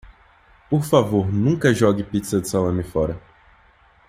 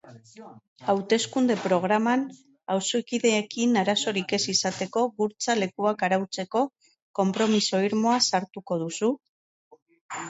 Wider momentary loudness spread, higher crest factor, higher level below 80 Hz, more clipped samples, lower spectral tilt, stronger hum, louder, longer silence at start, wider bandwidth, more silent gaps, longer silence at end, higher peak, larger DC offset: about the same, 7 LU vs 8 LU; about the same, 18 dB vs 18 dB; first, -46 dBFS vs -72 dBFS; neither; first, -6.5 dB/octave vs -3.5 dB/octave; neither; first, -20 LUFS vs -25 LUFS; about the same, 0.05 s vs 0.05 s; first, 15.5 kHz vs 8.2 kHz; second, none vs 0.68-0.76 s, 7.02-7.14 s, 9.29-9.71 s, 9.82-9.86 s, 10.01-10.09 s; first, 0.9 s vs 0 s; first, -2 dBFS vs -8 dBFS; neither